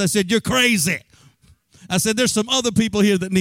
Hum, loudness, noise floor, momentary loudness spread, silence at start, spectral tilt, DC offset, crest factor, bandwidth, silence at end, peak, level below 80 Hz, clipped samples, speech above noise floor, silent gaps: none; -18 LUFS; -54 dBFS; 5 LU; 0 s; -3.5 dB/octave; under 0.1%; 14 dB; 16.5 kHz; 0 s; -4 dBFS; -50 dBFS; under 0.1%; 35 dB; none